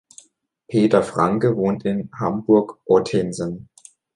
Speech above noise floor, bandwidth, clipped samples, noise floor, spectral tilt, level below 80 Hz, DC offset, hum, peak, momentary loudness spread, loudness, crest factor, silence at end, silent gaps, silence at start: 40 dB; 11 kHz; under 0.1%; -59 dBFS; -7 dB/octave; -54 dBFS; under 0.1%; none; -4 dBFS; 9 LU; -20 LUFS; 18 dB; 0.5 s; none; 0.7 s